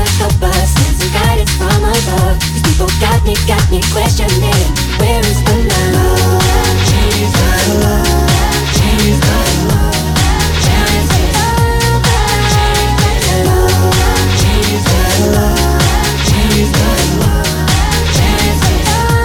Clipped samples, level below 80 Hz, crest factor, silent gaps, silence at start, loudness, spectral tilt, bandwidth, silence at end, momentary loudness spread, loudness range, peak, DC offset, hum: under 0.1%; -16 dBFS; 10 dB; none; 0 s; -11 LUFS; -4.5 dB/octave; 19 kHz; 0 s; 2 LU; 1 LU; 0 dBFS; under 0.1%; none